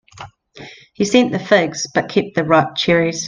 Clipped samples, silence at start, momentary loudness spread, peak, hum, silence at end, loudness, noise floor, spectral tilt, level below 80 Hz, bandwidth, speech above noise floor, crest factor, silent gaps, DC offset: under 0.1%; 0.15 s; 7 LU; 0 dBFS; none; 0 s; -16 LUFS; -39 dBFS; -4.5 dB/octave; -52 dBFS; 10 kHz; 24 dB; 18 dB; none; under 0.1%